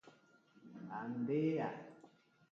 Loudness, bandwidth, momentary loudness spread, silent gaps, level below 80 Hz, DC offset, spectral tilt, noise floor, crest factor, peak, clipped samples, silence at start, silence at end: -40 LUFS; 7.2 kHz; 20 LU; none; -90 dBFS; under 0.1%; -7.5 dB/octave; -69 dBFS; 16 dB; -26 dBFS; under 0.1%; 0.05 s; 0.45 s